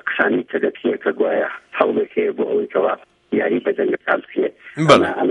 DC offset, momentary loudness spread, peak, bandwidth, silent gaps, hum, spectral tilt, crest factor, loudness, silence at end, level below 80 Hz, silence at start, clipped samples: under 0.1%; 10 LU; 0 dBFS; 11 kHz; none; none; -5.5 dB/octave; 18 dB; -19 LUFS; 0 s; -58 dBFS; 0.05 s; under 0.1%